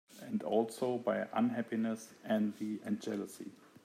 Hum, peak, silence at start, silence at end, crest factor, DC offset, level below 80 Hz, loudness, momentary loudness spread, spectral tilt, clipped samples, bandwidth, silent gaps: none; -18 dBFS; 0.1 s; 0.3 s; 18 dB; under 0.1%; -88 dBFS; -36 LUFS; 9 LU; -6 dB/octave; under 0.1%; 15.5 kHz; none